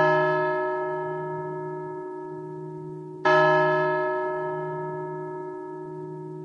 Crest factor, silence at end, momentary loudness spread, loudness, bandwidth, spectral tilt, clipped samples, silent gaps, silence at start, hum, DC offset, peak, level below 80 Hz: 18 dB; 0 s; 17 LU; -26 LUFS; 6.8 kHz; -7 dB/octave; under 0.1%; none; 0 s; none; under 0.1%; -8 dBFS; -74 dBFS